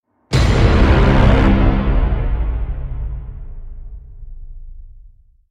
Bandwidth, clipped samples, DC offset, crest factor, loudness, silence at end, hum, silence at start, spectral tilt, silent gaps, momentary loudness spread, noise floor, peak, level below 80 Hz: 9.6 kHz; under 0.1%; under 0.1%; 14 dB; -16 LUFS; 0.4 s; none; 0.3 s; -7 dB/octave; none; 24 LU; -44 dBFS; 0 dBFS; -18 dBFS